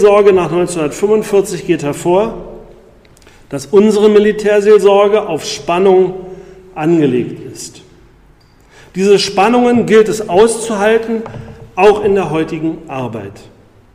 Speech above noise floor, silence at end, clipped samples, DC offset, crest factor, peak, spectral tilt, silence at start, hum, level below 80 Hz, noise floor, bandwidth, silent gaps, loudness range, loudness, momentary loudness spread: 34 dB; 0.55 s; under 0.1%; under 0.1%; 12 dB; 0 dBFS; -5.5 dB/octave; 0 s; none; -44 dBFS; -45 dBFS; 15 kHz; none; 5 LU; -12 LUFS; 19 LU